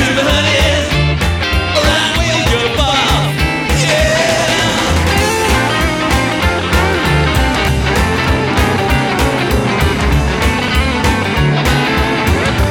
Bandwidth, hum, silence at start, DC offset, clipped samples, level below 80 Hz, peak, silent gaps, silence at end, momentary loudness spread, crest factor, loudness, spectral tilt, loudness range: 19 kHz; none; 0 s; under 0.1%; under 0.1%; -20 dBFS; 0 dBFS; none; 0 s; 3 LU; 12 dB; -12 LUFS; -4.5 dB/octave; 1 LU